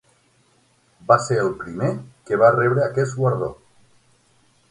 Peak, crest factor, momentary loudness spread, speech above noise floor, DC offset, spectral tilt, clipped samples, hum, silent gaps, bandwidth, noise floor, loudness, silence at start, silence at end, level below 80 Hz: 0 dBFS; 22 dB; 12 LU; 41 dB; under 0.1%; -6.5 dB/octave; under 0.1%; none; none; 11.5 kHz; -60 dBFS; -20 LUFS; 1.1 s; 1.15 s; -56 dBFS